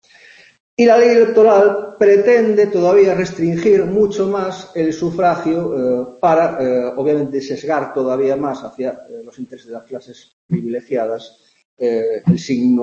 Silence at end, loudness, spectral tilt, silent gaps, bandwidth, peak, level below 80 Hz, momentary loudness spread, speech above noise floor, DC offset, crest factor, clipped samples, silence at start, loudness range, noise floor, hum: 0 s; -15 LUFS; -7 dB/octave; 10.33-10.49 s, 11.65-11.77 s; 7.4 kHz; 0 dBFS; -56 dBFS; 18 LU; 30 dB; under 0.1%; 14 dB; under 0.1%; 0.8 s; 11 LU; -45 dBFS; none